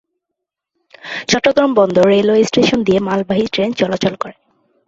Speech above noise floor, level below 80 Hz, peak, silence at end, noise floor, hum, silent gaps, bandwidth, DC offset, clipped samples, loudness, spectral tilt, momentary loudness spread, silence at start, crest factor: 66 dB; -50 dBFS; 0 dBFS; 0.55 s; -79 dBFS; none; none; 8 kHz; under 0.1%; under 0.1%; -14 LUFS; -5 dB/octave; 14 LU; 1.05 s; 16 dB